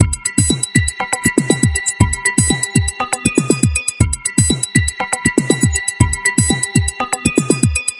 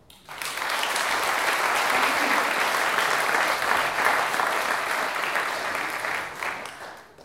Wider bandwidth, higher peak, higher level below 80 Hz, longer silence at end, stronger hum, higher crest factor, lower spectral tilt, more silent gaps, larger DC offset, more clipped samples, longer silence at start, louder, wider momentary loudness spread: second, 12 kHz vs 17 kHz; first, 0 dBFS vs -6 dBFS; first, -30 dBFS vs -64 dBFS; about the same, 0 s vs 0 s; neither; about the same, 16 dB vs 20 dB; first, -4 dB/octave vs -0.5 dB/octave; neither; neither; neither; second, 0 s vs 0.3 s; first, -15 LUFS vs -24 LUFS; second, 3 LU vs 10 LU